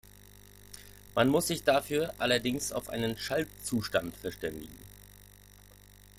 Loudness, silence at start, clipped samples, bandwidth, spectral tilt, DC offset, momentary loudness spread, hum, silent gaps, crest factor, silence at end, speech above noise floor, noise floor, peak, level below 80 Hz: -31 LUFS; 0.6 s; under 0.1%; 16.5 kHz; -4 dB/octave; under 0.1%; 22 LU; 50 Hz at -50 dBFS; none; 22 dB; 0.95 s; 25 dB; -55 dBFS; -10 dBFS; -56 dBFS